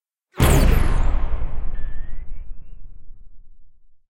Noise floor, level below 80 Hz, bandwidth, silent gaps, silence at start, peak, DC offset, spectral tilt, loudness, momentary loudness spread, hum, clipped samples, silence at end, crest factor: -41 dBFS; -22 dBFS; 16.5 kHz; none; 0.35 s; -2 dBFS; under 0.1%; -5.5 dB/octave; -22 LUFS; 25 LU; none; under 0.1%; 0.45 s; 16 dB